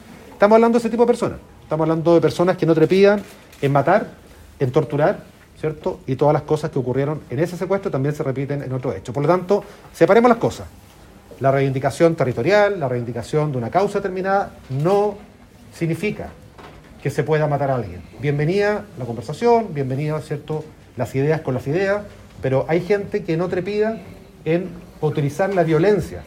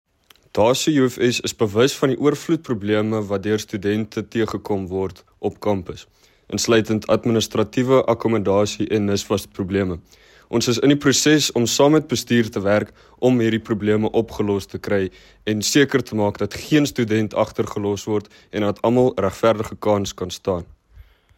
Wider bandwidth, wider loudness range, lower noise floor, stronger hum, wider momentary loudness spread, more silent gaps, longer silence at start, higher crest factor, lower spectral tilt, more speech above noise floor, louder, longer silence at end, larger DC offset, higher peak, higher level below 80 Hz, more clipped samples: about the same, 16 kHz vs 16.5 kHz; about the same, 5 LU vs 5 LU; second, -43 dBFS vs -50 dBFS; neither; first, 12 LU vs 9 LU; neither; second, 0.05 s vs 0.55 s; about the same, 18 dB vs 16 dB; first, -7.5 dB/octave vs -5 dB/octave; second, 25 dB vs 30 dB; about the same, -20 LUFS vs -20 LUFS; second, 0 s vs 0.35 s; neither; first, 0 dBFS vs -4 dBFS; about the same, -50 dBFS vs -50 dBFS; neither